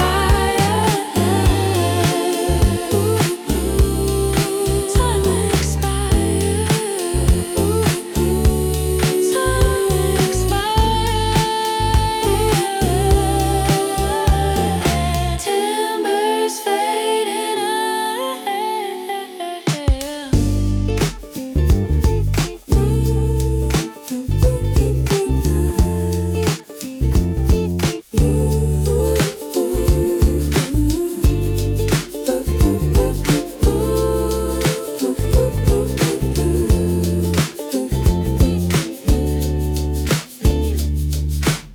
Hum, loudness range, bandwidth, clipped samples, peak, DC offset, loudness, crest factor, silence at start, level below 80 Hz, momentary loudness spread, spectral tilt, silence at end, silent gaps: none; 2 LU; over 20 kHz; under 0.1%; -4 dBFS; under 0.1%; -18 LUFS; 12 dB; 0 s; -22 dBFS; 5 LU; -5.5 dB/octave; 0 s; none